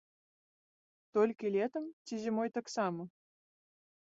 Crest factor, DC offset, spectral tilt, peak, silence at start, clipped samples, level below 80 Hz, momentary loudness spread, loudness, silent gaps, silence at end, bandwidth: 20 dB; under 0.1%; -5.5 dB/octave; -18 dBFS; 1.15 s; under 0.1%; -84 dBFS; 11 LU; -36 LUFS; 1.93-2.05 s; 1.05 s; 7.6 kHz